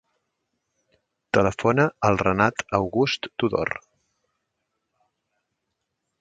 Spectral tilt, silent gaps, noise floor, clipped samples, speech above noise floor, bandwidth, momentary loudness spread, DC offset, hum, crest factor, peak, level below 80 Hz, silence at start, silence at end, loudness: -6 dB/octave; none; -79 dBFS; under 0.1%; 57 dB; 9.2 kHz; 5 LU; under 0.1%; none; 24 dB; -2 dBFS; -52 dBFS; 1.35 s; 2.45 s; -23 LUFS